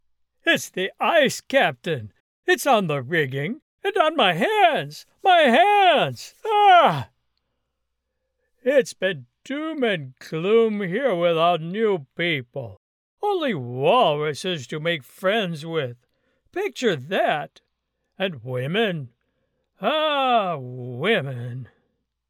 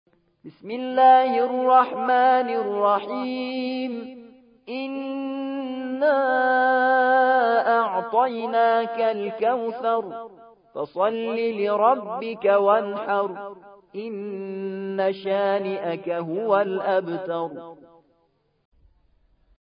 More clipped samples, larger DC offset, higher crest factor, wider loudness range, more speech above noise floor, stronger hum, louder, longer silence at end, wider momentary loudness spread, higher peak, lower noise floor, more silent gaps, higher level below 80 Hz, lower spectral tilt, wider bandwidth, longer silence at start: neither; neither; about the same, 20 dB vs 18 dB; about the same, 8 LU vs 7 LU; first, 56 dB vs 45 dB; neither; about the same, -21 LUFS vs -22 LUFS; second, 0.65 s vs 1.95 s; about the same, 14 LU vs 14 LU; about the same, -4 dBFS vs -6 dBFS; first, -77 dBFS vs -67 dBFS; first, 2.20-2.43 s, 3.62-3.78 s, 12.77-13.17 s vs none; about the same, -74 dBFS vs -72 dBFS; second, -4.5 dB/octave vs -9.5 dB/octave; first, 17.5 kHz vs 5.2 kHz; about the same, 0.45 s vs 0.45 s